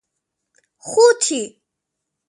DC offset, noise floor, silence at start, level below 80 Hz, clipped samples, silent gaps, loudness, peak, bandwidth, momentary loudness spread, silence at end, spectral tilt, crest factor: under 0.1%; -80 dBFS; 0.85 s; -76 dBFS; under 0.1%; none; -16 LUFS; -2 dBFS; 11.5 kHz; 19 LU; 0.8 s; -1 dB/octave; 18 dB